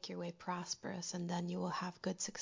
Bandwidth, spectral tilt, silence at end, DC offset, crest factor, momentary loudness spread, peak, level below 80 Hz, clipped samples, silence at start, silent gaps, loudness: 7.8 kHz; -4 dB/octave; 0 s; under 0.1%; 16 dB; 3 LU; -26 dBFS; -78 dBFS; under 0.1%; 0 s; none; -42 LUFS